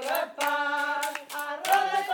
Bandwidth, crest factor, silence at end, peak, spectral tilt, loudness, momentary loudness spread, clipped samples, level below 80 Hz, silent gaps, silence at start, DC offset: 19.5 kHz; 18 dB; 0 s; -10 dBFS; 0 dB/octave; -27 LUFS; 9 LU; under 0.1%; -86 dBFS; none; 0 s; under 0.1%